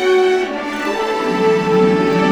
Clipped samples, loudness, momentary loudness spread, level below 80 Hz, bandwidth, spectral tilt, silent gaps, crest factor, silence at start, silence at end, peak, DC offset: under 0.1%; -16 LUFS; 7 LU; -48 dBFS; 13.5 kHz; -6 dB/octave; none; 12 dB; 0 s; 0 s; -2 dBFS; under 0.1%